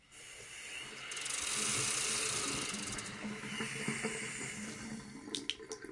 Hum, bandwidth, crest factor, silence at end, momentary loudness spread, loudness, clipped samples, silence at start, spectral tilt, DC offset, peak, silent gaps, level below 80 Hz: none; 11.5 kHz; 24 dB; 0 s; 14 LU; -37 LUFS; under 0.1%; 0.05 s; -1.5 dB/octave; under 0.1%; -16 dBFS; none; -66 dBFS